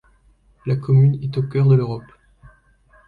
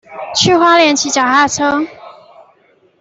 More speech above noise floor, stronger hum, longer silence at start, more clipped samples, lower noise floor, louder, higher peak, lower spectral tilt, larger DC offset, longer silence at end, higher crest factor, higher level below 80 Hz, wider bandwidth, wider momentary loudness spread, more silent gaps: about the same, 39 dB vs 41 dB; neither; first, 0.65 s vs 0.1 s; neither; first, -56 dBFS vs -52 dBFS; second, -18 LUFS vs -11 LUFS; second, -6 dBFS vs 0 dBFS; first, -11 dB/octave vs -2.5 dB/octave; neither; first, 1.1 s vs 0.9 s; about the same, 14 dB vs 14 dB; about the same, -48 dBFS vs -52 dBFS; second, 4.7 kHz vs 8.4 kHz; first, 14 LU vs 10 LU; neither